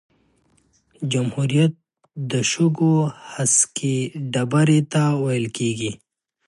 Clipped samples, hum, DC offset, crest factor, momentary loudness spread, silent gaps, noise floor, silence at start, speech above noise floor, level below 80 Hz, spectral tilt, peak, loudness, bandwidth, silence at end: under 0.1%; none; under 0.1%; 18 dB; 11 LU; none; -62 dBFS; 1 s; 42 dB; -62 dBFS; -5 dB/octave; -4 dBFS; -20 LUFS; 11.5 kHz; 0.5 s